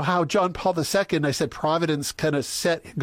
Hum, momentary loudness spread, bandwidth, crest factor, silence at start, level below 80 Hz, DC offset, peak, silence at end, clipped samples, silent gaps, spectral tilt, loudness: none; 3 LU; 16.5 kHz; 14 dB; 0 s; -52 dBFS; under 0.1%; -10 dBFS; 0 s; under 0.1%; none; -4.5 dB/octave; -24 LUFS